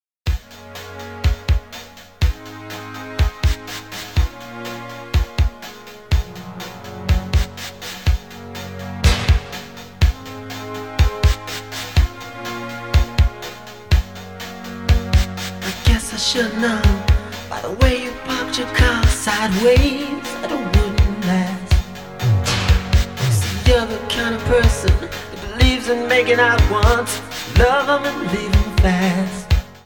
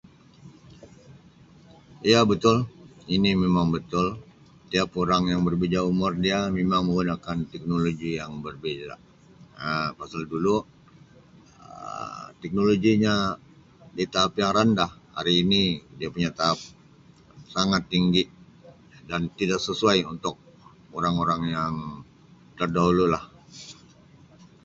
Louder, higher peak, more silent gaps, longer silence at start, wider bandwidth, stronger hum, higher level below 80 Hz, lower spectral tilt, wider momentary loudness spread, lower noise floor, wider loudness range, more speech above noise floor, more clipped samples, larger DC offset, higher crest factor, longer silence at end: first, -19 LUFS vs -25 LUFS; first, 0 dBFS vs -4 dBFS; neither; second, 0.25 s vs 0.45 s; first, 18.5 kHz vs 7.8 kHz; neither; first, -22 dBFS vs -50 dBFS; about the same, -5 dB/octave vs -5.5 dB/octave; about the same, 16 LU vs 15 LU; second, -38 dBFS vs -53 dBFS; about the same, 8 LU vs 6 LU; second, 22 dB vs 30 dB; neither; first, 0.4% vs under 0.1%; about the same, 18 dB vs 22 dB; second, 0.05 s vs 0.9 s